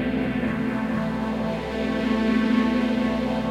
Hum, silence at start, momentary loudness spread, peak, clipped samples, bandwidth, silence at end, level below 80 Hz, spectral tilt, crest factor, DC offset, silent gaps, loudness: none; 0 s; 5 LU; -10 dBFS; under 0.1%; 10.5 kHz; 0 s; -42 dBFS; -7 dB/octave; 14 dB; under 0.1%; none; -24 LUFS